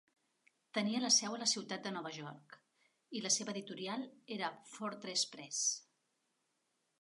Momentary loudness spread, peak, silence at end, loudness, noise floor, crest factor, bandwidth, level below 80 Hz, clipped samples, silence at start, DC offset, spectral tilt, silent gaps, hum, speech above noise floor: 15 LU; -18 dBFS; 1.2 s; -37 LUFS; -83 dBFS; 22 dB; 11.5 kHz; under -90 dBFS; under 0.1%; 0.75 s; under 0.1%; -1.5 dB/octave; none; none; 44 dB